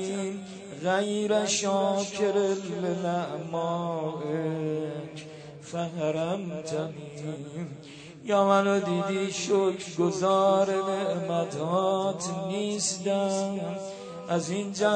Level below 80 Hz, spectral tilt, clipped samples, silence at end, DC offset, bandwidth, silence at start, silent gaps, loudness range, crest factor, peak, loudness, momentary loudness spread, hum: -72 dBFS; -4.5 dB/octave; under 0.1%; 0 s; under 0.1%; 9.4 kHz; 0 s; none; 7 LU; 20 dB; -8 dBFS; -28 LUFS; 14 LU; none